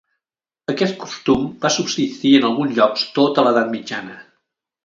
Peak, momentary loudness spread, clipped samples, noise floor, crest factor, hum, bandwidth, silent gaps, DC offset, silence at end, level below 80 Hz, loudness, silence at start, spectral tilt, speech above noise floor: 0 dBFS; 12 LU; under 0.1%; -88 dBFS; 18 dB; none; 7.6 kHz; none; under 0.1%; 0.65 s; -54 dBFS; -18 LUFS; 0.7 s; -4.5 dB/octave; 70 dB